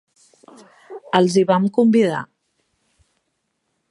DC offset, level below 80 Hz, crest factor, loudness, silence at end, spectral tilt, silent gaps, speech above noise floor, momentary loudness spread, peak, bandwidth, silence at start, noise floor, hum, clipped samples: under 0.1%; -68 dBFS; 20 dB; -17 LUFS; 1.65 s; -6 dB/octave; none; 57 dB; 24 LU; 0 dBFS; 11.5 kHz; 0.9 s; -73 dBFS; none; under 0.1%